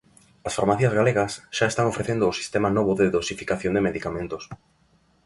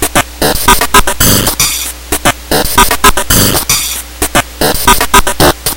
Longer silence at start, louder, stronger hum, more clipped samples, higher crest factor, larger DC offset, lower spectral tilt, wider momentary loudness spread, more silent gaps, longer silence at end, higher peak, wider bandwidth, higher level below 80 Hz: first, 0.45 s vs 0 s; second, -24 LUFS vs -8 LUFS; neither; second, under 0.1% vs 3%; first, 20 dB vs 10 dB; neither; first, -5.5 dB/octave vs -2.5 dB/octave; first, 11 LU vs 6 LU; neither; first, 0.7 s vs 0 s; second, -6 dBFS vs 0 dBFS; second, 11.5 kHz vs over 20 kHz; second, -50 dBFS vs -20 dBFS